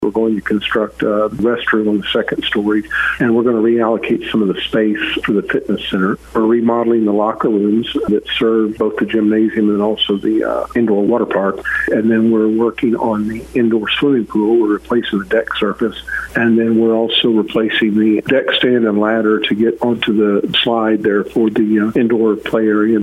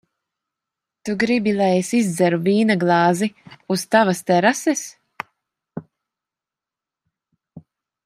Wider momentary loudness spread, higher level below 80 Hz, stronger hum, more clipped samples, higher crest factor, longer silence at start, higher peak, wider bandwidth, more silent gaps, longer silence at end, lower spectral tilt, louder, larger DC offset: second, 4 LU vs 19 LU; first, -46 dBFS vs -66 dBFS; neither; neither; second, 14 dB vs 20 dB; second, 0 s vs 1.05 s; about the same, 0 dBFS vs -2 dBFS; second, 12.5 kHz vs 15.5 kHz; neither; second, 0 s vs 0.45 s; first, -6.5 dB/octave vs -5 dB/octave; first, -15 LUFS vs -19 LUFS; neither